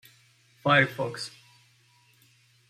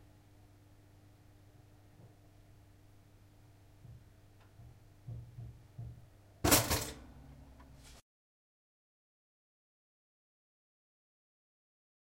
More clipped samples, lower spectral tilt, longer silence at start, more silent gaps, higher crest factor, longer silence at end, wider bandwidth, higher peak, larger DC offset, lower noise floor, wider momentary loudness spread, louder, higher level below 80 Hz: neither; first, -5 dB/octave vs -3 dB/octave; second, 0.65 s vs 2.05 s; neither; second, 24 dB vs 32 dB; second, 1.4 s vs 4 s; about the same, 15.5 kHz vs 16 kHz; first, -8 dBFS vs -12 dBFS; neither; about the same, -62 dBFS vs -61 dBFS; second, 16 LU vs 31 LU; first, -25 LUFS vs -32 LUFS; second, -70 dBFS vs -56 dBFS